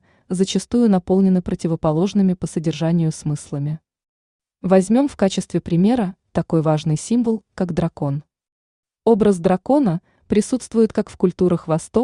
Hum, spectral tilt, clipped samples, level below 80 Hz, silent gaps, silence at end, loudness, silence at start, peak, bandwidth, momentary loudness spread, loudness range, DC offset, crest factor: none; -7 dB/octave; under 0.1%; -48 dBFS; 4.09-4.39 s, 8.52-8.83 s; 0 s; -19 LUFS; 0.3 s; -4 dBFS; 11 kHz; 9 LU; 2 LU; under 0.1%; 16 dB